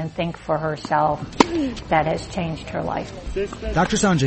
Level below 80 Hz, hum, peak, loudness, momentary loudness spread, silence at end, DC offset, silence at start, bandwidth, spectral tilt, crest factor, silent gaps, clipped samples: -38 dBFS; none; 0 dBFS; -23 LUFS; 9 LU; 0 s; under 0.1%; 0 s; 8.8 kHz; -5 dB/octave; 22 dB; none; under 0.1%